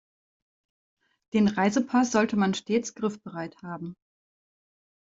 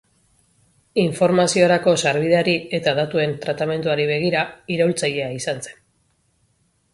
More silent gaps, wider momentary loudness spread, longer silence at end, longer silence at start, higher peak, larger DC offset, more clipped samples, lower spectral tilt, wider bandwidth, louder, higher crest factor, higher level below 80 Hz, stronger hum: neither; first, 15 LU vs 9 LU; about the same, 1.1 s vs 1.2 s; first, 1.35 s vs 0.95 s; second, -10 dBFS vs -2 dBFS; neither; neither; about the same, -5.5 dB/octave vs -4.5 dB/octave; second, 7.8 kHz vs 11.5 kHz; second, -25 LUFS vs -20 LUFS; about the same, 20 dB vs 20 dB; second, -66 dBFS vs -60 dBFS; neither